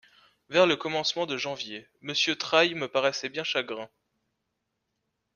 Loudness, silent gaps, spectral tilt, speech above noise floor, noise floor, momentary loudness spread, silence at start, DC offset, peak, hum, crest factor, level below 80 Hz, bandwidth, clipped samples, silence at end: -27 LUFS; none; -3 dB/octave; 53 dB; -81 dBFS; 14 LU; 0.5 s; under 0.1%; -6 dBFS; none; 24 dB; -72 dBFS; 7.2 kHz; under 0.1%; 1.5 s